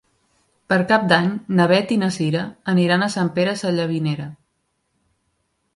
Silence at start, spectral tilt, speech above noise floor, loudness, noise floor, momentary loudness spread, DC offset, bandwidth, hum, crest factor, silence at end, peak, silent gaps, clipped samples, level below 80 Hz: 0.7 s; -6 dB/octave; 52 dB; -19 LUFS; -71 dBFS; 7 LU; under 0.1%; 11.5 kHz; none; 20 dB; 1.4 s; -2 dBFS; none; under 0.1%; -62 dBFS